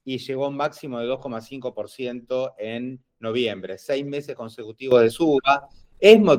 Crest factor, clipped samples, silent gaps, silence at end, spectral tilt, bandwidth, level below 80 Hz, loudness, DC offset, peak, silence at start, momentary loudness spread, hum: 20 dB; under 0.1%; none; 0 s; -5.5 dB/octave; 15.5 kHz; -60 dBFS; -23 LUFS; under 0.1%; 0 dBFS; 0.05 s; 16 LU; none